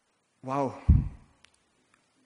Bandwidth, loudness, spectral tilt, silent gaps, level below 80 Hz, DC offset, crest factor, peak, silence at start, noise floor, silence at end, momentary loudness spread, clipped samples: 8.4 kHz; -28 LUFS; -9.5 dB/octave; none; -34 dBFS; under 0.1%; 20 dB; -10 dBFS; 0.45 s; -68 dBFS; 1.1 s; 15 LU; under 0.1%